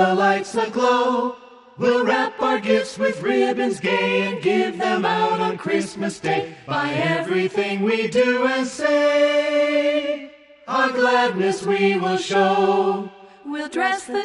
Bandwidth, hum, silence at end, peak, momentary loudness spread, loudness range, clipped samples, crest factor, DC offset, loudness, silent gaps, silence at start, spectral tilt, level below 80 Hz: 11.5 kHz; none; 0 s; -4 dBFS; 8 LU; 2 LU; under 0.1%; 16 dB; under 0.1%; -20 LUFS; none; 0 s; -5 dB/octave; -64 dBFS